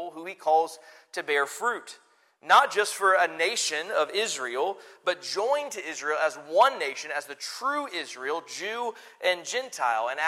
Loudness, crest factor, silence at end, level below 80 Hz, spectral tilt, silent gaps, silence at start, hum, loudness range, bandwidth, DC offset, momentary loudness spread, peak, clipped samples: -27 LUFS; 22 dB; 0 s; -84 dBFS; -0.5 dB/octave; none; 0 s; none; 4 LU; 16 kHz; under 0.1%; 12 LU; -6 dBFS; under 0.1%